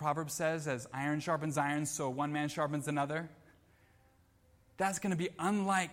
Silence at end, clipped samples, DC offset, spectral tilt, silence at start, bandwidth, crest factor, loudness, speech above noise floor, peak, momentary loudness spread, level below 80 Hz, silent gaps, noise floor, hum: 0 s; under 0.1%; under 0.1%; -5 dB/octave; 0 s; 16.5 kHz; 18 dB; -35 LUFS; 33 dB; -18 dBFS; 4 LU; -72 dBFS; none; -67 dBFS; none